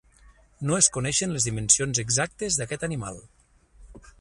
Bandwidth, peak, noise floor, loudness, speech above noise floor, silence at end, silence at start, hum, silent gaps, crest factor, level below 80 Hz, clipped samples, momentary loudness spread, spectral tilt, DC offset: 11.5 kHz; -2 dBFS; -56 dBFS; -23 LUFS; 30 dB; 0.1 s; 0.6 s; none; none; 26 dB; -50 dBFS; under 0.1%; 14 LU; -2.5 dB/octave; under 0.1%